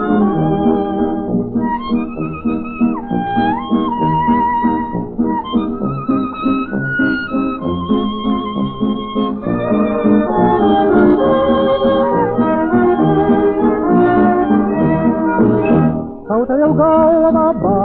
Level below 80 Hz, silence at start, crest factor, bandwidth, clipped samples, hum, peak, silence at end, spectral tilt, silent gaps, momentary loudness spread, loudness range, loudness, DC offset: -40 dBFS; 0 s; 14 dB; 4.5 kHz; under 0.1%; none; 0 dBFS; 0 s; -11.5 dB/octave; none; 8 LU; 5 LU; -15 LUFS; under 0.1%